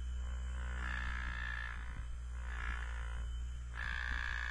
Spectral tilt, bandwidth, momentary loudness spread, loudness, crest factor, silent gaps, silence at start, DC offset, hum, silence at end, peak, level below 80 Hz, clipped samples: -4.5 dB/octave; 10.5 kHz; 7 LU; -42 LUFS; 14 dB; none; 0 s; under 0.1%; none; 0 s; -26 dBFS; -42 dBFS; under 0.1%